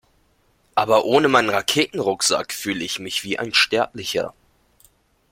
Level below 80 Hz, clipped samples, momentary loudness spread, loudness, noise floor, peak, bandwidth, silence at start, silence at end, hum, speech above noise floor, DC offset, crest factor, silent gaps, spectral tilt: -60 dBFS; under 0.1%; 9 LU; -20 LUFS; -62 dBFS; 0 dBFS; 16.5 kHz; 0.75 s; 1 s; none; 41 dB; under 0.1%; 22 dB; none; -2.5 dB/octave